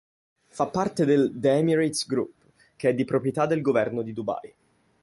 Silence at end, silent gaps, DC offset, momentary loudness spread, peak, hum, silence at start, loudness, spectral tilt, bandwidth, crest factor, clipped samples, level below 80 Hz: 0.55 s; none; under 0.1%; 10 LU; -8 dBFS; none; 0.55 s; -25 LUFS; -6 dB/octave; 11.5 kHz; 16 dB; under 0.1%; -64 dBFS